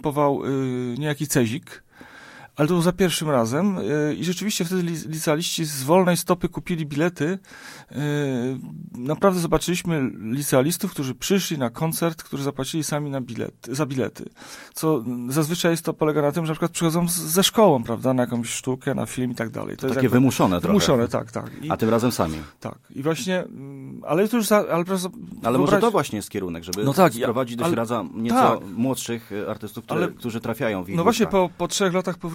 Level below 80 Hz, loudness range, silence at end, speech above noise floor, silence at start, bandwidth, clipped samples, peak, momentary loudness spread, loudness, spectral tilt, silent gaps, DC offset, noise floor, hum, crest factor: -52 dBFS; 4 LU; 0 s; 22 dB; 0.05 s; 16.5 kHz; under 0.1%; -2 dBFS; 11 LU; -23 LUFS; -5 dB/octave; none; under 0.1%; -45 dBFS; none; 20 dB